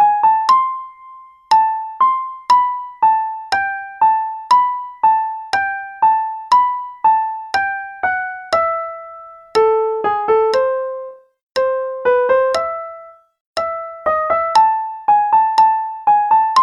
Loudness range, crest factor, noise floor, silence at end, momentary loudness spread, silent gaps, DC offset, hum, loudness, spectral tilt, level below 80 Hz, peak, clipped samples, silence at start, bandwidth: 3 LU; 16 dB; -40 dBFS; 0 s; 10 LU; 11.43-11.50 s, 13.40-13.54 s; under 0.1%; none; -16 LUFS; -2.5 dB/octave; -58 dBFS; 0 dBFS; under 0.1%; 0 s; 11 kHz